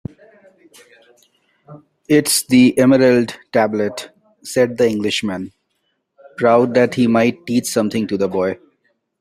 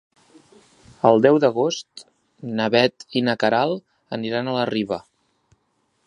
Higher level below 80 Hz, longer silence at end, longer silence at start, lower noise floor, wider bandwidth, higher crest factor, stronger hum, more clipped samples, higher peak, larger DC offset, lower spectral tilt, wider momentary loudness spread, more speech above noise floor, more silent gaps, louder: first, -58 dBFS vs -66 dBFS; second, 0.65 s vs 1.05 s; first, 1.7 s vs 1.05 s; about the same, -69 dBFS vs -69 dBFS; first, 15.5 kHz vs 11 kHz; second, 16 dB vs 22 dB; neither; neither; about the same, -2 dBFS vs -2 dBFS; neither; about the same, -4.5 dB/octave vs -5.5 dB/octave; about the same, 16 LU vs 15 LU; first, 54 dB vs 49 dB; neither; first, -16 LUFS vs -21 LUFS